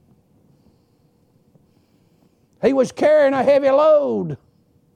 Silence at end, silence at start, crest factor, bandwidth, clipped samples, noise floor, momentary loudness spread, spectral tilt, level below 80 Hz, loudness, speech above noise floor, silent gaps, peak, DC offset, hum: 0.6 s; 2.6 s; 14 dB; 10 kHz; under 0.1%; -59 dBFS; 11 LU; -6.5 dB/octave; -64 dBFS; -16 LUFS; 44 dB; none; -6 dBFS; under 0.1%; none